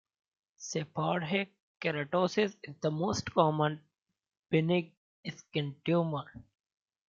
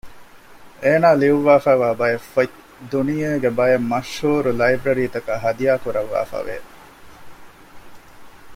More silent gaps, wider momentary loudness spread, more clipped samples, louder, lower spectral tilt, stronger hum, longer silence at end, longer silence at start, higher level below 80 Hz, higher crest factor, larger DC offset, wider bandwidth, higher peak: first, 1.60-1.75 s, 4.97-5.23 s vs none; first, 16 LU vs 10 LU; neither; second, -32 LUFS vs -19 LUFS; about the same, -5.5 dB/octave vs -6.5 dB/octave; neither; first, 0.7 s vs 0 s; first, 0.6 s vs 0.05 s; second, -70 dBFS vs -50 dBFS; about the same, 22 dB vs 18 dB; neither; second, 7.6 kHz vs 16 kHz; second, -10 dBFS vs -2 dBFS